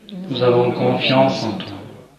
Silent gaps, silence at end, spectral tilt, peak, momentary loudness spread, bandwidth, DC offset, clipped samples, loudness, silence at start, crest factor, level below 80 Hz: none; 0.15 s; -6.5 dB/octave; -2 dBFS; 15 LU; 11.5 kHz; under 0.1%; under 0.1%; -17 LUFS; 0.1 s; 16 dB; -60 dBFS